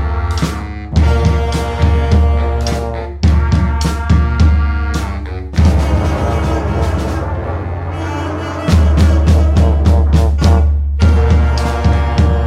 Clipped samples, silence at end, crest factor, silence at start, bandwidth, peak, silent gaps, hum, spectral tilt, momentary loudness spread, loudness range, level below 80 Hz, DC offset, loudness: under 0.1%; 0 s; 10 dB; 0 s; 10 kHz; -2 dBFS; none; none; -7 dB/octave; 9 LU; 4 LU; -14 dBFS; under 0.1%; -14 LUFS